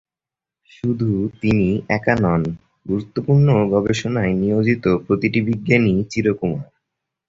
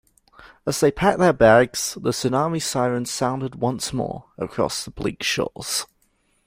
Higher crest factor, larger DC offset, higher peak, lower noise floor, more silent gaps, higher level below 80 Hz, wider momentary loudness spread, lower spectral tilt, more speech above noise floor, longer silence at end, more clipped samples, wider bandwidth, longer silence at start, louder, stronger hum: about the same, 18 dB vs 20 dB; neither; about the same, 0 dBFS vs -2 dBFS; first, -89 dBFS vs -65 dBFS; neither; about the same, -44 dBFS vs -48 dBFS; second, 9 LU vs 13 LU; first, -7.5 dB/octave vs -4 dB/octave; first, 71 dB vs 44 dB; about the same, 0.65 s vs 0.6 s; neither; second, 7.8 kHz vs 16 kHz; first, 0.85 s vs 0.4 s; first, -19 LUFS vs -22 LUFS; neither